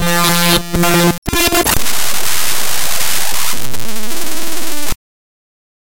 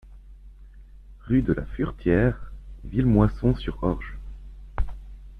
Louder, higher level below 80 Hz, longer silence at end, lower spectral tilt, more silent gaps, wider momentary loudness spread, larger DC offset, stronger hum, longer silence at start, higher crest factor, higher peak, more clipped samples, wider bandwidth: first, -15 LUFS vs -25 LUFS; about the same, -30 dBFS vs -34 dBFS; first, 0.9 s vs 0 s; second, -2.5 dB/octave vs -10 dB/octave; first, 1.18-1.22 s vs none; second, 11 LU vs 22 LU; first, 40% vs under 0.1%; neither; about the same, 0 s vs 0.05 s; second, 14 dB vs 22 dB; first, 0 dBFS vs -4 dBFS; neither; first, 17.5 kHz vs 5.2 kHz